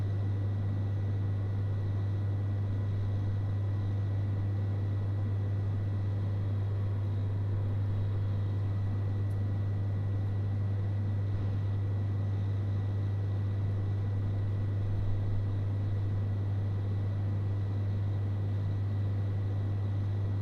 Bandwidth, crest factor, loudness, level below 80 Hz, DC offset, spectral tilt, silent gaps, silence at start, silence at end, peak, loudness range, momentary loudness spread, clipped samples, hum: 4.4 kHz; 10 dB; -33 LUFS; -48 dBFS; under 0.1%; -9.5 dB/octave; none; 0 s; 0 s; -20 dBFS; 0 LU; 0 LU; under 0.1%; none